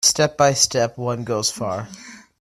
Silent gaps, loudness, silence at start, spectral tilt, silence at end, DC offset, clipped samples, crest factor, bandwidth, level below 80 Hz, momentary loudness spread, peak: none; -19 LUFS; 0 s; -2.5 dB/octave; 0.25 s; under 0.1%; under 0.1%; 20 dB; 15.5 kHz; -56 dBFS; 15 LU; -2 dBFS